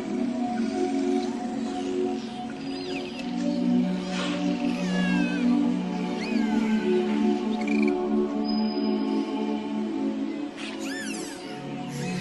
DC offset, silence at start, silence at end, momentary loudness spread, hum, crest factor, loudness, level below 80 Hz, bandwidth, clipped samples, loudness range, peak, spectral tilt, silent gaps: under 0.1%; 0 s; 0 s; 9 LU; none; 14 dB; -27 LUFS; -60 dBFS; 12 kHz; under 0.1%; 4 LU; -12 dBFS; -6 dB/octave; none